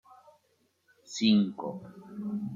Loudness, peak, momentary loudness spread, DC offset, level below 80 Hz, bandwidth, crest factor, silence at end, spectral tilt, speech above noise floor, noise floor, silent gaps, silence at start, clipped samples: -29 LUFS; -12 dBFS; 19 LU; under 0.1%; -76 dBFS; 7.6 kHz; 20 dB; 0 s; -5.5 dB/octave; 43 dB; -72 dBFS; none; 1.1 s; under 0.1%